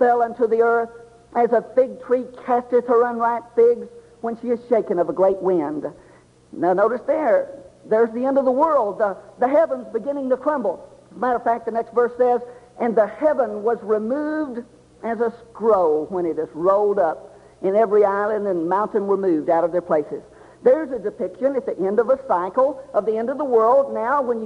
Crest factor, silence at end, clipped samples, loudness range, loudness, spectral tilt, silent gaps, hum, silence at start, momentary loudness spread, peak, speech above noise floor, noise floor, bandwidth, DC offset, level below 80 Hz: 16 dB; 0 s; under 0.1%; 2 LU; -20 LUFS; -8 dB/octave; none; none; 0 s; 9 LU; -4 dBFS; 31 dB; -51 dBFS; 8.8 kHz; under 0.1%; -62 dBFS